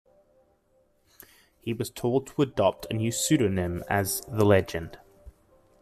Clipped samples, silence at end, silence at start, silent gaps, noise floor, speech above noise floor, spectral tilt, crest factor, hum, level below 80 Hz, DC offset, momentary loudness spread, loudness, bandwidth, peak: under 0.1%; 0.5 s; 1.65 s; none; -67 dBFS; 41 dB; -5 dB/octave; 20 dB; none; -56 dBFS; under 0.1%; 13 LU; -26 LUFS; 15 kHz; -8 dBFS